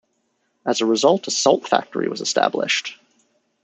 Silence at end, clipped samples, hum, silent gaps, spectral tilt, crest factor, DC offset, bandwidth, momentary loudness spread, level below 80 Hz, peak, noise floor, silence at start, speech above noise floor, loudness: 0.7 s; under 0.1%; none; none; -2.5 dB/octave; 20 dB; under 0.1%; 8.4 kHz; 8 LU; -74 dBFS; -2 dBFS; -69 dBFS; 0.65 s; 50 dB; -20 LUFS